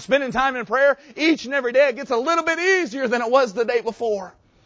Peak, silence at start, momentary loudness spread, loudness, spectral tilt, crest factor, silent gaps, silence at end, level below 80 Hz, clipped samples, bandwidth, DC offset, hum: -4 dBFS; 0 s; 6 LU; -20 LUFS; -3.5 dB/octave; 16 dB; none; 0.35 s; -58 dBFS; under 0.1%; 8 kHz; under 0.1%; none